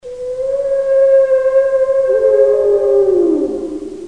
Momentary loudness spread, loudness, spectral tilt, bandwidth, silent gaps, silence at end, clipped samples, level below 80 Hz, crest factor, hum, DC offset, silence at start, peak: 10 LU; -13 LUFS; -6.5 dB/octave; 9.4 kHz; none; 0 s; under 0.1%; -48 dBFS; 12 dB; none; 0.5%; 0.05 s; -2 dBFS